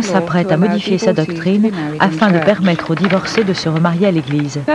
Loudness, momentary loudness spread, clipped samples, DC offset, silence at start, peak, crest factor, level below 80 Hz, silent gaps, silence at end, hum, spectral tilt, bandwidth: -14 LUFS; 4 LU; under 0.1%; 0.1%; 0 s; 0 dBFS; 14 dB; -52 dBFS; none; 0 s; none; -6.5 dB/octave; 10.5 kHz